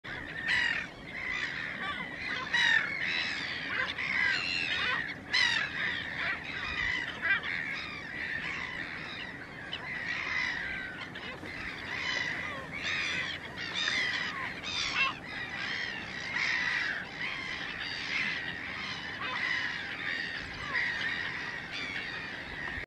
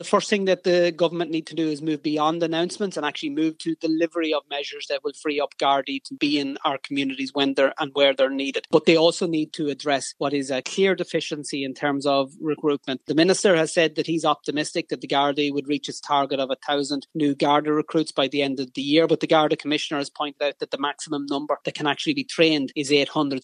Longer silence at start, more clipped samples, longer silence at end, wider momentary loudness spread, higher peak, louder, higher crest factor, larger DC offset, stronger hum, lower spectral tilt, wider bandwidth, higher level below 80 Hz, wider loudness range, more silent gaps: about the same, 0.05 s vs 0 s; neither; about the same, 0 s vs 0.05 s; about the same, 10 LU vs 8 LU; second, -14 dBFS vs -4 dBFS; second, -32 LUFS vs -23 LUFS; about the same, 20 dB vs 20 dB; neither; neither; second, -2.5 dB/octave vs -4 dB/octave; first, 13.5 kHz vs 11 kHz; first, -58 dBFS vs -78 dBFS; about the same, 5 LU vs 3 LU; neither